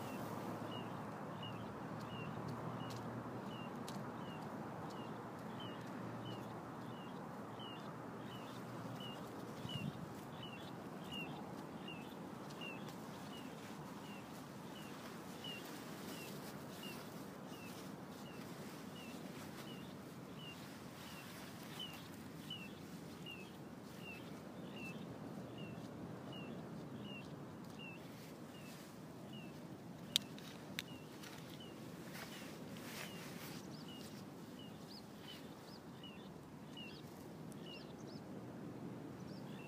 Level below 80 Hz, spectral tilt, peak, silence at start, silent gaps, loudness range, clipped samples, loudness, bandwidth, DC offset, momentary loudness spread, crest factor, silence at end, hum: -76 dBFS; -4.5 dB/octave; -12 dBFS; 0 s; none; 5 LU; under 0.1%; -50 LUFS; 15.5 kHz; under 0.1%; 6 LU; 38 dB; 0 s; none